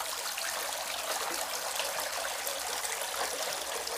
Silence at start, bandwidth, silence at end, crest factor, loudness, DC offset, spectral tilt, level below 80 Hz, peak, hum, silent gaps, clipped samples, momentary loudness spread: 0 s; 16 kHz; 0 s; 20 dB; -33 LUFS; under 0.1%; 1.5 dB/octave; -66 dBFS; -14 dBFS; none; none; under 0.1%; 1 LU